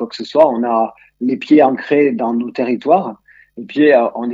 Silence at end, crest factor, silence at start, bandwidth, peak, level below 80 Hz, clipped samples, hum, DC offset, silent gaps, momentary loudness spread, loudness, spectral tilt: 0 s; 14 dB; 0 s; 7.6 kHz; 0 dBFS; -64 dBFS; under 0.1%; none; under 0.1%; none; 11 LU; -15 LUFS; -7 dB/octave